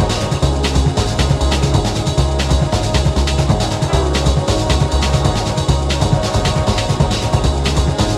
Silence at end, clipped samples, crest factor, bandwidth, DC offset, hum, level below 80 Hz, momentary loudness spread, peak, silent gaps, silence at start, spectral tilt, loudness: 0 s; under 0.1%; 14 dB; 13 kHz; under 0.1%; none; -20 dBFS; 1 LU; 0 dBFS; none; 0 s; -5.5 dB/octave; -16 LUFS